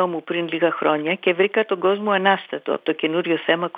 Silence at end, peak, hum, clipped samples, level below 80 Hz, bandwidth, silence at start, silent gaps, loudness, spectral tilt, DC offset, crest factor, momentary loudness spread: 0 s; -2 dBFS; none; under 0.1%; under -90 dBFS; 4.8 kHz; 0 s; none; -21 LUFS; -8 dB/octave; under 0.1%; 18 dB; 6 LU